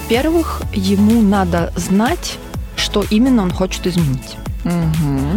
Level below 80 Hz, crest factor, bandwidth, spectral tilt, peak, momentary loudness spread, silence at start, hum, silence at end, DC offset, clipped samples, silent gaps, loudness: -28 dBFS; 14 dB; 17.5 kHz; -6 dB/octave; -2 dBFS; 11 LU; 0 s; none; 0 s; under 0.1%; under 0.1%; none; -16 LUFS